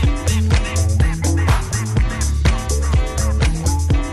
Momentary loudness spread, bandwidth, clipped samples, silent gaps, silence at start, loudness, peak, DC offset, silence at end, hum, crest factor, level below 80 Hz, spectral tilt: 3 LU; 14 kHz; under 0.1%; none; 0 s; -18 LUFS; -2 dBFS; under 0.1%; 0 s; none; 14 dB; -18 dBFS; -5 dB/octave